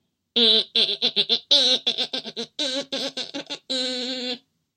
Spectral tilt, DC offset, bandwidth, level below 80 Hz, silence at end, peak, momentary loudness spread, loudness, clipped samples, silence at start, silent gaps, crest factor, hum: -1 dB/octave; under 0.1%; 16.5 kHz; -80 dBFS; 0.4 s; -4 dBFS; 15 LU; -21 LUFS; under 0.1%; 0.35 s; none; 22 dB; none